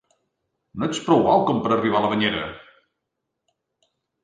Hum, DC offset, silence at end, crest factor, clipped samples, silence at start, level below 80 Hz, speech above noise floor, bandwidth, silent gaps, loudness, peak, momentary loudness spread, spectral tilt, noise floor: none; under 0.1%; 1.65 s; 20 dB; under 0.1%; 0.75 s; -56 dBFS; 60 dB; 9.4 kHz; none; -21 LUFS; -4 dBFS; 12 LU; -5.5 dB/octave; -80 dBFS